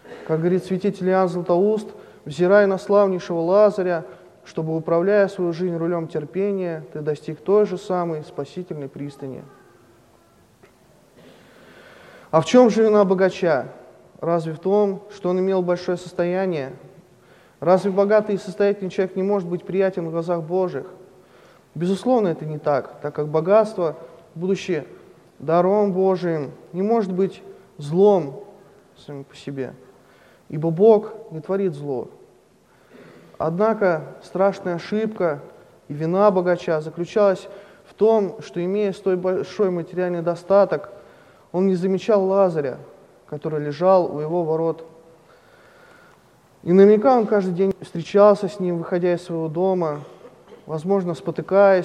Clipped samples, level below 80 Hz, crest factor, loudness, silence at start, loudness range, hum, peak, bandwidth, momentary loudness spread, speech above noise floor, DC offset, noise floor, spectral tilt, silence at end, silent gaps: under 0.1%; -66 dBFS; 20 dB; -21 LUFS; 0.05 s; 6 LU; none; -2 dBFS; 10 kHz; 16 LU; 35 dB; under 0.1%; -55 dBFS; -7.5 dB/octave; 0 s; none